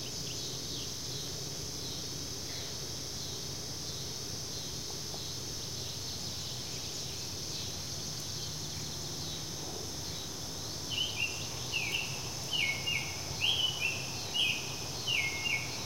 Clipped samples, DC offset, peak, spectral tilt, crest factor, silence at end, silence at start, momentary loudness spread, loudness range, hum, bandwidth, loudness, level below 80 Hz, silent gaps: under 0.1%; 0.3%; -16 dBFS; -1.5 dB/octave; 20 dB; 0 s; 0 s; 7 LU; 6 LU; none; 16 kHz; -35 LUFS; -56 dBFS; none